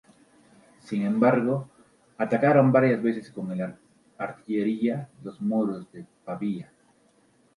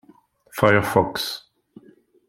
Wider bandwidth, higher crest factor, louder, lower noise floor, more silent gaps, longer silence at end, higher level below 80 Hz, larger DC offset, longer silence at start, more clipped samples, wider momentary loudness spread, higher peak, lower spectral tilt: second, 11.5 kHz vs 16.5 kHz; about the same, 22 dB vs 22 dB; second, -26 LUFS vs -20 LUFS; first, -63 dBFS vs -55 dBFS; neither; about the same, 0.95 s vs 0.9 s; second, -70 dBFS vs -52 dBFS; neither; first, 0.85 s vs 0.55 s; neither; about the same, 17 LU vs 17 LU; about the same, -4 dBFS vs -2 dBFS; first, -9 dB/octave vs -5 dB/octave